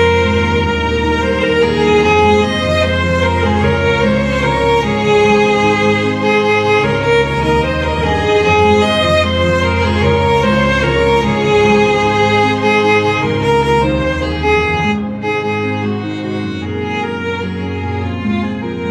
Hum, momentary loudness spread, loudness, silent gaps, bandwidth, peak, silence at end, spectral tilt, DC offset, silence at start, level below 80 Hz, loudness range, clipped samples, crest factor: none; 8 LU; -13 LUFS; none; 12 kHz; -2 dBFS; 0 s; -6 dB/octave; under 0.1%; 0 s; -30 dBFS; 5 LU; under 0.1%; 12 dB